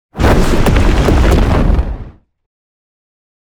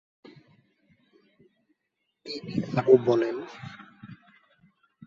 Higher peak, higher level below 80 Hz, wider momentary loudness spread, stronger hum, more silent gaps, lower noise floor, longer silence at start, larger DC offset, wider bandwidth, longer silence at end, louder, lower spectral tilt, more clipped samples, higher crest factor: first, 0 dBFS vs -6 dBFS; first, -14 dBFS vs -68 dBFS; second, 7 LU vs 28 LU; neither; neither; second, -32 dBFS vs -80 dBFS; second, 0.15 s vs 2.25 s; neither; first, 18 kHz vs 7.2 kHz; first, 1.4 s vs 0.95 s; first, -12 LUFS vs -25 LUFS; about the same, -6.5 dB/octave vs -7.5 dB/octave; neither; second, 12 dB vs 24 dB